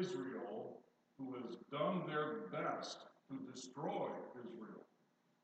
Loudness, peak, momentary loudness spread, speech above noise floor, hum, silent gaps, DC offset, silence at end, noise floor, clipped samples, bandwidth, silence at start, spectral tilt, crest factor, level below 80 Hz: -45 LUFS; -26 dBFS; 14 LU; 34 dB; none; none; under 0.1%; 0.6 s; -78 dBFS; under 0.1%; 8.8 kHz; 0 s; -5.5 dB/octave; 20 dB; under -90 dBFS